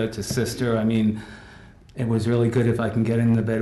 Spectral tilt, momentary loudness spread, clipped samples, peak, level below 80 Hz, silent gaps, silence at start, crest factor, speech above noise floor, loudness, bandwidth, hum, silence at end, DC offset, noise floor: -7 dB/octave; 14 LU; under 0.1%; -12 dBFS; -48 dBFS; none; 0 s; 12 dB; 24 dB; -22 LUFS; 12 kHz; none; 0 s; under 0.1%; -46 dBFS